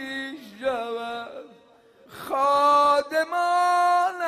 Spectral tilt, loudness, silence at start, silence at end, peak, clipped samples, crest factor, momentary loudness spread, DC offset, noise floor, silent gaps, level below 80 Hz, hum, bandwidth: -2.5 dB/octave; -22 LUFS; 0 s; 0 s; -8 dBFS; under 0.1%; 14 dB; 18 LU; under 0.1%; -55 dBFS; none; -68 dBFS; none; 15 kHz